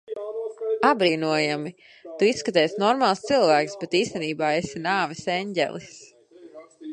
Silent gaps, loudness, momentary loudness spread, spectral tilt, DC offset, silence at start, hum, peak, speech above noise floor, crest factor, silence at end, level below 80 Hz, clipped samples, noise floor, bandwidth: none; -23 LUFS; 13 LU; -4.5 dB/octave; under 0.1%; 0.1 s; none; -4 dBFS; 23 dB; 20 dB; 0 s; -66 dBFS; under 0.1%; -46 dBFS; 10 kHz